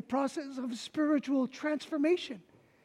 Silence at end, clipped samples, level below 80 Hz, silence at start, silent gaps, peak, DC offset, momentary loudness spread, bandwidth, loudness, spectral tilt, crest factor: 0.45 s; under 0.1%; -80 dBFS; 0.1 s; none; -18 dBFS; under 0.1%; 9 LU; 12 kHz; -33 LUFS; -4.5 dB/octave; 14 dB